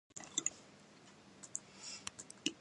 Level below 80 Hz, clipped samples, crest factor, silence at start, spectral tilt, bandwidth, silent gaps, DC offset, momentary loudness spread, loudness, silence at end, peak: -80 dBFS; under 0.1%; 28 dB; 0.1 s; -0.5 dB/octave; 11.5 kHz; none; under 0.1%; 21 LU; -43 LUFS; 0 s; -18 dBFS